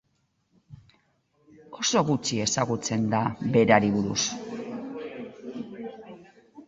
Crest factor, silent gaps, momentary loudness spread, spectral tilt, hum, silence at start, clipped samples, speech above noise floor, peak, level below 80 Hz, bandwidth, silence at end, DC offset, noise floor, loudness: 24 dB; none; 19 LU; -4 dB/octave; none; 0.7 s; under 0.1%; 48 dB; -4 dBFS; -60 dBFS; 8 kHz; 0.05 s; under 0.1%; -72 dBFS; -25 LUFS